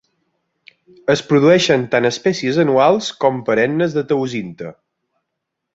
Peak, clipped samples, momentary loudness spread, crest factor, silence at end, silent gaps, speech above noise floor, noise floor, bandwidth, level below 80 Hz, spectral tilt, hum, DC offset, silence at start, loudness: -2 dBFS; under 0.1%; 13 LU; 16 dB; 1 s; none; 62 dB; -78 dBFS; 8 kHz; -58 dBFS; -5.5 dB/octave; none; under 0.1%; 1.1 s; -16 LUFS